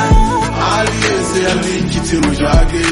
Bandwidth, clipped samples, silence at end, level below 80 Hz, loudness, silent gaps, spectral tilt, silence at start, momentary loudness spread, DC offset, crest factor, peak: 11.5 kHz; under 0.1%; 0 s; -18 dBFS; -14 LUFS; none; -5 dB/octave; 0 s; 3 LU; under 0.1%; 12 dB; 0 dBFS